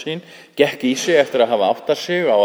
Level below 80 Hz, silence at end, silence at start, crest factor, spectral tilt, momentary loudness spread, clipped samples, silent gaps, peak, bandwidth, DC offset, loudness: -70 dBFS; 0 s; 0 s; 18 dB; -4 dB/octave; 12 LU; under 0.1%; none; 0 dBFS; over 20 kHz; under 0.1%; -18 LUFS